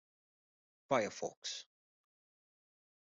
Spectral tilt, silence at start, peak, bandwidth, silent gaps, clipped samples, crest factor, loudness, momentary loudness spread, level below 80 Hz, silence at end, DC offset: -3 dB/octave; 0.9 s; -18 dBFS; 8.2 kHz; 1.37-1.42 s; under 0.1%; 26 dB; -39 LUFS; 9 LU; -84 dBFS; 1.35 s; under 0.1%